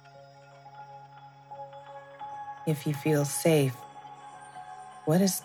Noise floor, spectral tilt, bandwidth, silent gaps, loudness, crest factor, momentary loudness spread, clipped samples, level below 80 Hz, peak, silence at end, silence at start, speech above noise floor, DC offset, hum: -52 dBFS; -5.5 dB/octave; 18.5 kHz; none; -28 LUFS; 18 dB; 24 LU; under 0.1%; -78 dBFS; -12 dBFS; 0 s; 0.05 s; 26 dB; under 0.1%; none